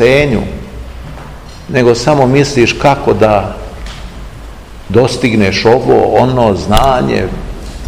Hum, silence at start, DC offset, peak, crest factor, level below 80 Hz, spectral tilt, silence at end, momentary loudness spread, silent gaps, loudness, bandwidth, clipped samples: none; 0 s; 0.8%; 0 dBFS; 12 dB; -26 dBFS; -6 dB/octave; 0 s; 20 LU; none; -10 LUFS; over 20 kHz; 2%